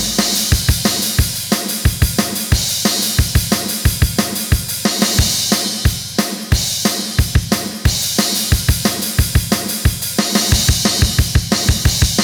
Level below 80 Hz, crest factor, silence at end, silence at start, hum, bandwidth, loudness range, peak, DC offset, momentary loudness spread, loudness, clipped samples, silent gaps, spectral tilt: -22 dBFS; 16 dB; 0 s; 0 s; none; over 20 kHz; 1 LU; 0 dBFS; under 0.1%; 4 LU; -15 LUFS; under 0.1%; none; -3.5 dB/octave